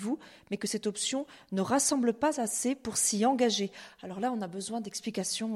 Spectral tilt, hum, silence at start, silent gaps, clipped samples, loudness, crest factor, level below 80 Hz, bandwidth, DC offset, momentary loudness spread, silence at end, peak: -3 dB/octave; none; 0 s; none; under 0.1%; -30 LUFS; 16 dB; -70 dBFS; 14.5 kHz; under 0.1%; 10 LU; 0 s; -14 dBFS